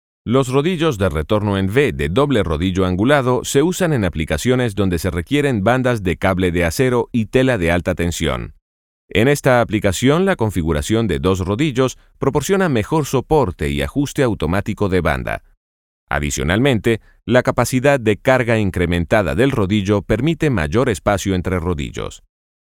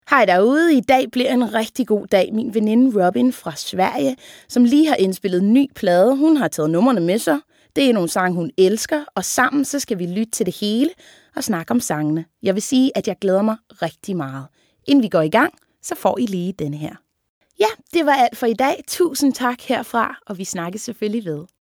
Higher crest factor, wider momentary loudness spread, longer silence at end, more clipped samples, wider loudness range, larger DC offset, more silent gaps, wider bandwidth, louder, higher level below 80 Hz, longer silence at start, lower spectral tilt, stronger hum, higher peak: about the same, 16 dB vs 18 dB; second, 6 LU vs 11 LU; first, 0.45 s vs 0.15 s; neither; about the same, 3 LU vs 4 LU; neither; first, 8.62-9.08 s, 15.57-16.07 s vs 17.29-17.41 s; about the same, 17.5 kHz vs 18.5 kHz; about the same, -17 LUFS vs -18 LUFS; first, -34 dBFS vs -62 dBFS; first, 0.25 s vs 0.1 s; about the same, -6 dB/octave vs -5 dB/octave; neither; about the same, 0 dBFS vs 0 dBFS